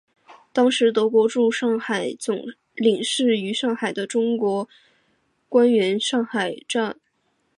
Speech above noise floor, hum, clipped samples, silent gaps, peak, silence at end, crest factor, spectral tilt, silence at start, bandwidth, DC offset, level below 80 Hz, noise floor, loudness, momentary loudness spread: 48 dB; none; under 0.1%; none; -6 dBFS; 0.65 s; 16 dB; -4 dB/octave; 0.3 s; 11 kHz; under 0.1%; -76 dBFS; -69 dBFS; -21 LUFS; 10 LU